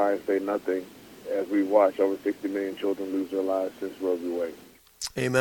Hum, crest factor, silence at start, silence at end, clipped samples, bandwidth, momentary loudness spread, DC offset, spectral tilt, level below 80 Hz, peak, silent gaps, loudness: none; 20 dB; 0 s; 0 s; under 0.1%; 19 kHz; 11 LU; under 0.1%; -5.5 dB/octave; -66 dBFS; -8 dBFS; none; -28 LUFS